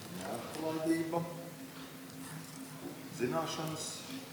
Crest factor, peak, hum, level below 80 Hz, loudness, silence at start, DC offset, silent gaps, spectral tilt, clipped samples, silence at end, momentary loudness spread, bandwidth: 20 dB; -20 dBFS; none; -76 dBFS; -39 LUFS; 0 s; under 0.1%; none; -4.5 dB/octave; under 0.1%; 0 s; 13 LU; over 20 kHz